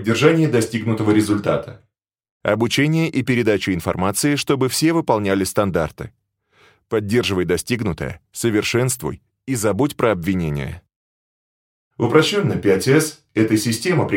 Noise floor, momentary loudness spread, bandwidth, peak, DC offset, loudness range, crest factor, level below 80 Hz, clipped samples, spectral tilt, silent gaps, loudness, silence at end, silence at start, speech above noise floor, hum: -57 dBFS; 11 LU; 17 kHz; -2 dBFS; under 0.1%; 3 LU; 18 dB; -48 dBFS; under 0.1%; -5 dB/octave; 2.31-2.40 s, 10.96-11.91 s; -19 LUFS; 0 s; 0 s; 38 dB; none